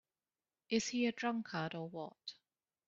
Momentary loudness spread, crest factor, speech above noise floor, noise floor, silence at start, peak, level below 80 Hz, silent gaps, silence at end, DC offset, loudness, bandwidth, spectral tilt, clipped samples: 13 LU; 22 dB; over 51 dB; under -90 dBFS; 0.7 s; -20 dBFS; -80 dBFS; none; 0.55 s; under 0.1%; -39 LUFS; 7.4 kHz; -3.5 dB/octave; under 0.1%